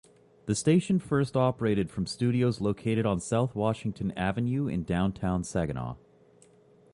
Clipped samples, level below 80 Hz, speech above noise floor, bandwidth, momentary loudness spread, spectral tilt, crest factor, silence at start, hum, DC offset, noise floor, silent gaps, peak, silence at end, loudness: under 0.1%; -50 dBFS; 31 dB; 11.5 kHz; 7 LU; -6.5 dB/octave; 16 dB; 0.45 s; none; under 0.1%; -59 dBFS; none; -12 dBFS; 1 s; -29 LUFS